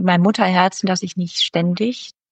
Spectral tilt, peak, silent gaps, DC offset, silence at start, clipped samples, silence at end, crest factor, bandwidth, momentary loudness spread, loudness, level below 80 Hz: -5 dB/octave; -2 dBFS; none; under 0.1%; 0 s; under 0.1%; 0.2 s; 16 dB; 8.6 kHz; 8 LU; -18 LUFS; -66 dBFS